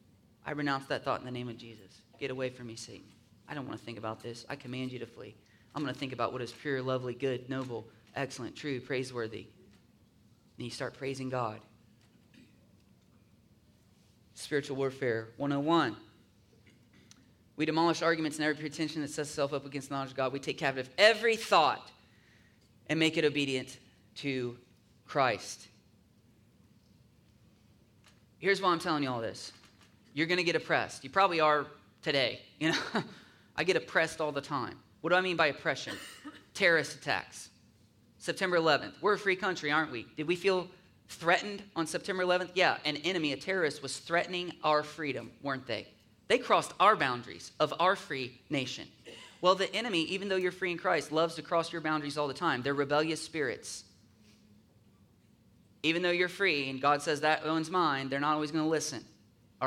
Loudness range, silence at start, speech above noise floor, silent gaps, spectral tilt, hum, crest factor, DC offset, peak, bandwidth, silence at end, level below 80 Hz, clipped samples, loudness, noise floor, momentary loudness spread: 10 LU; 0.45 s; 32 dB; none; -4 dB/octave; none; 26 dB; under 0.1%; -8 dBFS; 16 kHz; 0 s; -72 dBFS; under 0.1%; -32 LUFS; -64 dBFS; 16 LU